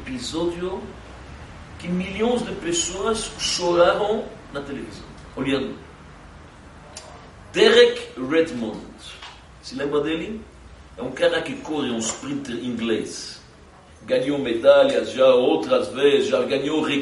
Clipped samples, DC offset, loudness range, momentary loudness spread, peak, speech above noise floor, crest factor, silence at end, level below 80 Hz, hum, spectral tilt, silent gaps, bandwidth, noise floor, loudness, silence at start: under 0.1%; under 0.1%; 8 LU; 23 LU; -2 dBFS; 26 dB; 22 dB; 0 s; -48 dBFS; none; -3.5 dB/octave; none; 11.5 kHz; -47 dBFS; -21 LUFS; 0 s